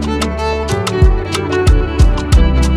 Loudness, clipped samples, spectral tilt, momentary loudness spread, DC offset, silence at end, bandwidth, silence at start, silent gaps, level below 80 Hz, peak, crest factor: -14 LUFS; under 0.1%; -6 dB/octave; 5 LU; under 0.1%; 0 s; 13 kHz; 0 s; none; -14 dBFS; 0 dBFS; 12 dB